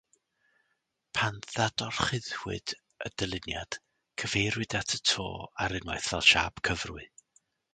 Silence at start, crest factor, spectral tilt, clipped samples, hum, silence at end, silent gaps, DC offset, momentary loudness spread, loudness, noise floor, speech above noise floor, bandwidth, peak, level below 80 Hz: 1.15 s; 26 dB; -2.5 dB/octave; under 0.1%; none; 0.65 s; none; under 0.1%; 16 LU; -30 LUFS; -79 dBFS; 48 dB; 9.6 kHz; -8 dBFS; -52 dBFS